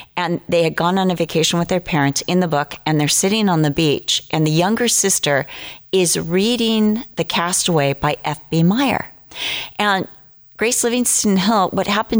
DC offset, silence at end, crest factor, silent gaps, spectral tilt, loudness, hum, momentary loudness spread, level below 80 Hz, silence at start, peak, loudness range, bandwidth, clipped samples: under 0.1%; 0 s; 12 dB; none; -4 dB/octave; -17 LUFS; none; 7 LU; -48 dBFS; 0 s; -6 dBFS; 2 LU; over 20 kHz; under 0.1%